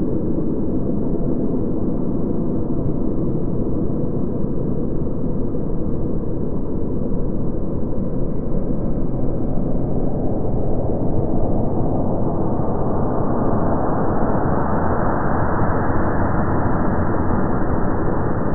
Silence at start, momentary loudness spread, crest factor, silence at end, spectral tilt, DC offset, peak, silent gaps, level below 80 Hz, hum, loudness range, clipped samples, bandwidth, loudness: 0 s; 4 LU; 14 dB; 0 s; -14.5 dB/octave; 9%; -4 dBFS; none; -26 dBFS; none; 4 LU; under 0.1%; 2.2 kHz; -22 LUFS